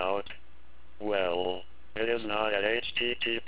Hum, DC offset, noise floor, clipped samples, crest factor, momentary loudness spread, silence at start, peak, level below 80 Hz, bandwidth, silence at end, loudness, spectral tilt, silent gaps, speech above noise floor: none; 1%; -58 dBFS; under 0.1%; 20 dB; 13 LU; 0 s; -12 dBFS; -58 dBFS; 4 kHz; 0.05 s; -30 LUFS; -1 dB/octave; none; 27 dB